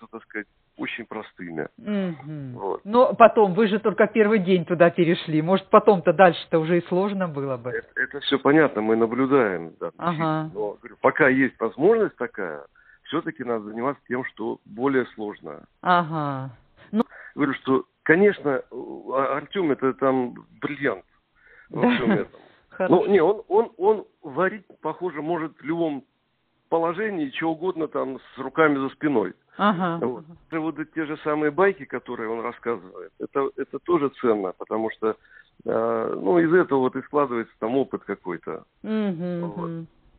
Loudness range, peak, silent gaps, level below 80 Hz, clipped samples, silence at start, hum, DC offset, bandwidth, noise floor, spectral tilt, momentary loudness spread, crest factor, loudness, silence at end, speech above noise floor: 8 LU; -2 dBFS; none; -64 dBFS; under 0.1%; 0 s; none; under 0.1%; 4.6 kHz; -70 dBFS; -5 dB/octave; 15 LU; 22 dB; -23 LUFS; 0.3 s; 47 dB